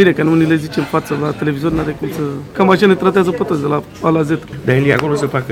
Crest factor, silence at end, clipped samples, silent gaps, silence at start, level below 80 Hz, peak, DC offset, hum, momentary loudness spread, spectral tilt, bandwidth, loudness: 14 dB; 0 s; under 0.1%; none; 0 s; -42 dBFS; 0 dBFS; under 0.1%; none; 8 LU; -7 dB/octave; 16.5 kHz; -15 LUFS